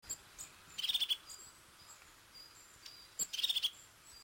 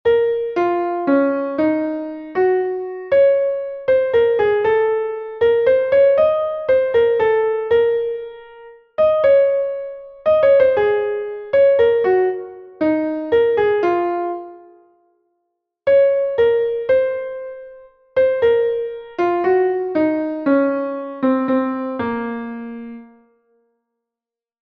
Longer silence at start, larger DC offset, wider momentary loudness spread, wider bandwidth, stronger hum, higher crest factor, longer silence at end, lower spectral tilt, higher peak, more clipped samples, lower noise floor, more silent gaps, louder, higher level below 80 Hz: about the same, 0.05 s vs 0.05 s; neither; first, 23 LU vs 13 LU; first, 16.5 kHz vs 5.2 kHz; neither; first, 20 dB vs 14 dB; second, 0 s vs 1.65 s; second, 2 dB/octave vs -7.5 dB/octave; second, -24 dBFS vs -4 dBFS; neither; second, -59 dBFS vs -89 dBFS; neither; second, -37 LUFS vs -17 LUFS; second, -74 dBFS vs -54 dBFS